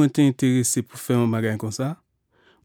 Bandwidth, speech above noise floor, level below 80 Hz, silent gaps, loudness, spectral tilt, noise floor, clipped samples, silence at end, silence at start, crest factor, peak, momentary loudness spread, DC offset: 18 kHz; 40 dB; -68 dBFS; none; -22 LUFS; -5.5 dB/octave; -62 dBFS; under 0.1%; 0.7 s; 0 s; 16 dB; -8 dBFS; 10 LU; under 0.1%